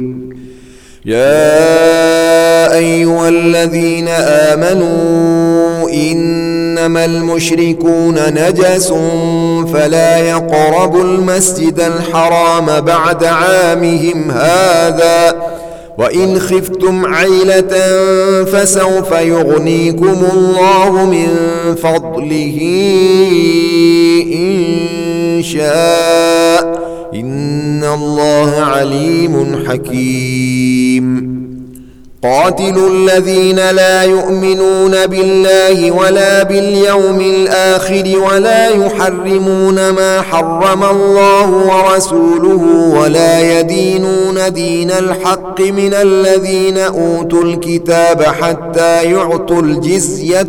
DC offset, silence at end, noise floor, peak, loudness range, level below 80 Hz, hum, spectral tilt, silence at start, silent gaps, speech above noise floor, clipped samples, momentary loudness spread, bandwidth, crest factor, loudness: under 0.1%; 0 s; -36 dBFS; 0 dBFS; 3 LU; -40 dBFS; none; -4.5 dB/octave; 0 s; none; 26 dB; under 0.1%; 6 LU; 18.5 kHz; 10 dB; -10 LUFS